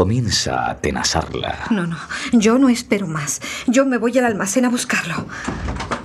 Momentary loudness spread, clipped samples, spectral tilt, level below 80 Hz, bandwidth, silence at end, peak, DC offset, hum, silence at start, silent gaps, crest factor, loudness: 10 LU; under 0.1%; -4 dB/octave; -40 dBFS; 14.5 kHz; 0 s; -2 dBFS; under 0.1%; none; 0 s; none; 18 dB; -19 LUFS